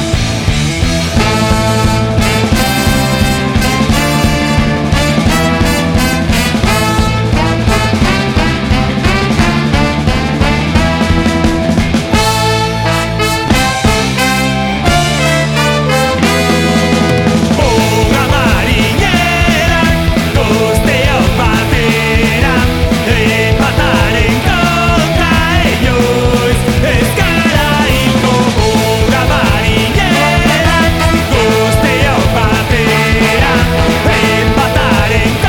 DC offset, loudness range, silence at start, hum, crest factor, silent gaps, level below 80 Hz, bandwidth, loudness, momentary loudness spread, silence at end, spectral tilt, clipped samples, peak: under 0.1%; 2 LU; 0 s; none; 10 dB; none; -20 dBFS; 19 kHz; -10 LUFS; 2 LU; 0 s; -5 dB/octave; under 0.1%; 0 dBFS